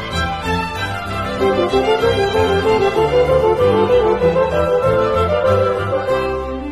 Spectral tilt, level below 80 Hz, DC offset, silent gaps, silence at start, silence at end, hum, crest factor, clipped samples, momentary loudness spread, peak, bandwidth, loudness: -6 dB/octave; -34 dBFS; under 0.1%; none; 0 s; 0 s; none; 12 dB; under 0.1%; 7 LU; -2 dBFS; 13 kHz; -16 LUFS